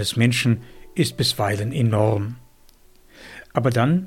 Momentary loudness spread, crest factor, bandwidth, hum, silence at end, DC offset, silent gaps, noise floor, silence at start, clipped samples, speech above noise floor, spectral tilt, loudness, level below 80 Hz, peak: 14 LU; 18 dB; 16 kHz; none; 0 s; under 0.1%; none; -51 dBFS; 0 s; under 0.1%; 31 dB; -5.5 dB/octave; -21 LUFS; -50 dBFS; -4 dBFS